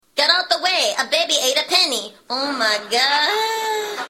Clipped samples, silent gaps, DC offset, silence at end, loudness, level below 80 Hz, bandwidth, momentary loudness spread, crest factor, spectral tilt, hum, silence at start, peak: under 0.1%; none; under 0.1%; 0 s; -17 LUFS; -74 dBFS; 16.5 kHz; 7 LU; 20 dB; 1 dB/octave; none; 0.15 s; 0 dBFS